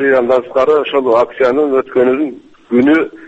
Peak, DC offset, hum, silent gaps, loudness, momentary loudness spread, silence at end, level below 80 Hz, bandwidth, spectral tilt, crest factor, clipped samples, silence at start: 0 dBFS; under 0.1%; none; none; -13 LUFS; 4 LU; 0 s; -52 dBFS; 8 kHz; -6.5 dB/octave; 12 dB; under 0.1%; 0 s